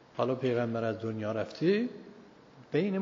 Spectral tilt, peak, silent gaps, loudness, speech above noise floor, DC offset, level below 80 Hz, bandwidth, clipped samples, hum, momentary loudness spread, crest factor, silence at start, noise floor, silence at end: -6 dB/octave; -14 dBFS; none; -32 LUFS; 24 dB; under 0.1%; -74 dBFS; 7.4 kHz; under 0.1%; none; 8 LU; 18 dB; 0.15 s; -55 dBFS; 0 s